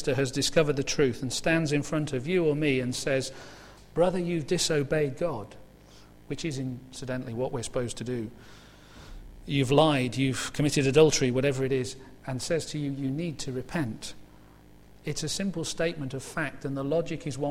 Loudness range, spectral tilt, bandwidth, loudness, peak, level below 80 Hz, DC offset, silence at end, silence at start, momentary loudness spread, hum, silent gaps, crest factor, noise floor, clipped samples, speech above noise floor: 9 LU; -5 dB/octave; 16 kHz; -28 LUFS; -6 dBFS; -50 dBFS; under 0.1%; 0 s; 0 s; 14 LU; 50 Hz at -55 dBFS; none; 22 dB; -52 dBFS; under 0.1%; 25 dB